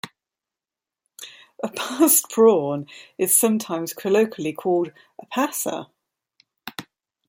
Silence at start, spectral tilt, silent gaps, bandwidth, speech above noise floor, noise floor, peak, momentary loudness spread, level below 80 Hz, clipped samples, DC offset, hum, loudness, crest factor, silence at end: 0.05 s; -3.5 dB/octave; none; 16.5 kHz; 68 dB; -89 dBFS; -2 dBFS; 23 LU; -72 dBFS; under 0.1%; under 0.1%; none; -21 LUFS; 20 dB; 0.45 s